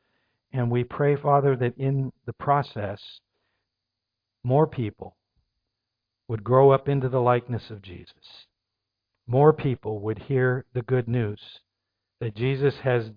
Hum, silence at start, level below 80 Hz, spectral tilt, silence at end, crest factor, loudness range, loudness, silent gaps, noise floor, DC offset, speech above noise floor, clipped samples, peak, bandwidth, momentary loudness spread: none; 0.55 s; -58 dBFS; -10.5 dB/octave; 0.05 s; 22 dB; 5 LU; -24 LUFS; none; -84 dBFS; under 0.1%; 61 dB; under 0.1%; -4 dBFS; 5.2 kHz; 16 LU